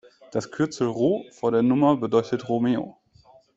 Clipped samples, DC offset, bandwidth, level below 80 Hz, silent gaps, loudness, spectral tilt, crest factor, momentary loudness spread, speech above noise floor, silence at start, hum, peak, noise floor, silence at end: under 0.1%; under 0.1%; 8 kHz; -62 dBFS; none; -24 LUFS; -7 dB/octave; 18 dB; 11 LU; 33 dB; 0.35 s; none; -6 dBFS; -55 dBFS; 0.65 s